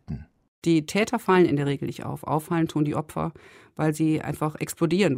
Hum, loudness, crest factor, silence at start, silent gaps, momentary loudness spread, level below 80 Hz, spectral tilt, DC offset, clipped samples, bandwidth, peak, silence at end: none; -25 LUFS; 16 dB; 0.1 s; 0.48-0.62 s; 12 LU; -54 dBFS; -6.5 dB/octave; under 0.1%; under 0.1%; 16 kHz; -8 dBFS; 0 s